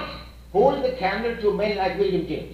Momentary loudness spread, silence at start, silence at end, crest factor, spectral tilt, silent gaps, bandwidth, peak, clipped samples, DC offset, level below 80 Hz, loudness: 6 LU; 0 s; 0 s; 18 dB; -7 dB/octave; none; 14.5 kHz; -6 dBFS; under 0.1%; under 0.1%; -44 dBFS; -23 LUFS